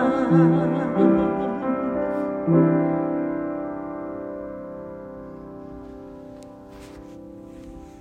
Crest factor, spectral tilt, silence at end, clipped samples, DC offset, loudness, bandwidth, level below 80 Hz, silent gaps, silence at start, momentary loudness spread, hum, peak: 18 dB; -10 dB/octave; 0 s; under 0.1%; under 0.1%; -22 LUFS; 5.8 kHz; -52 dBFS; none; 0 s; 23 LU; none; -6 dBFS